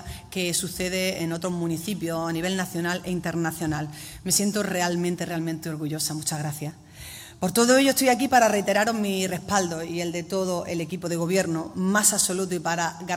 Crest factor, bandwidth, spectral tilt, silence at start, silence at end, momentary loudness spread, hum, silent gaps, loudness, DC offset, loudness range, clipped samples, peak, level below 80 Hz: 20 dB; 16 kHz; -3.5 dB/octave; 0 s; 0 s; 11 LU; none; none; -25 LUFS; under 0.1%; 5 LU; under 0.1%; -4 dBFS; -56 dBFS